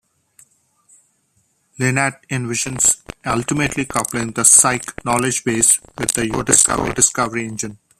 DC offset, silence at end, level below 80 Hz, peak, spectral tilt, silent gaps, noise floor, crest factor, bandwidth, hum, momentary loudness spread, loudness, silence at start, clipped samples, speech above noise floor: under 0.1%; 0.25 s; -46 dBFS; 0 dBFS; -2.5 dB/octave; none; -63 dBFS; 20 dB; 15.5 kHz; none; 12 LU; -16 LUFS; 1.8 s; under 0.1%; 46 dB